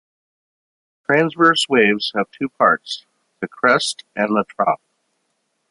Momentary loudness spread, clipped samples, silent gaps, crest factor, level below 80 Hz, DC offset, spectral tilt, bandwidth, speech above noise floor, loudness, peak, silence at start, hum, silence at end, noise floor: 15 LU; under 0.1%; none; 18 dB; -66 dBFS; under 0.1%; -4 dB/octave; 11.5 kHz; 53 dB; -18 LUFS; -2 dBFS; 1.1 s; none; 0.95 s; -71 dBFS